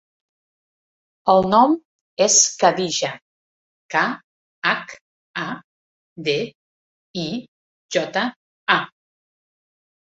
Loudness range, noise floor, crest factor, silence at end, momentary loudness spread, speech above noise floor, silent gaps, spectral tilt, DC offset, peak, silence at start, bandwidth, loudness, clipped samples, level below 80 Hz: 9 LU; under -90 dBFS; 22 dB; 1.3 s; 19 LU; over 71 dB; 1.85-2.17 s, 3.22-3.89 s, 4.24-4.62 s, 5.01-5.34 s, 5.64-6.16 s, 6.55-7.14 s, 7.48-7.89 s, 8.36-8.67 s; -2 dB/octave; under 0.1%; -2 dBFS; 1.25 s; 8.2 kHz; -20 LUFS; under 0.1%; -62 dBFS